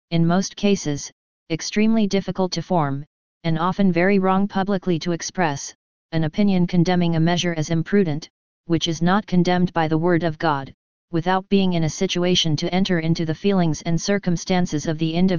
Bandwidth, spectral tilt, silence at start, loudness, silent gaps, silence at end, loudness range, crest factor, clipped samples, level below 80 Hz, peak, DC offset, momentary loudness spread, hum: 7.2 kHz; -5.5 dB/octave; 0.05 s; -21 LUFS; 1.12-1.46 s, 3.07-3.41 s, 5.75-6.09 s, 8.30-8.64 s, 10.74-11.08 s; 0 s; 1 LU; 16 dB; under 0.1%; -46 dBFS; -4 dBFS; 2%; 7 LU; none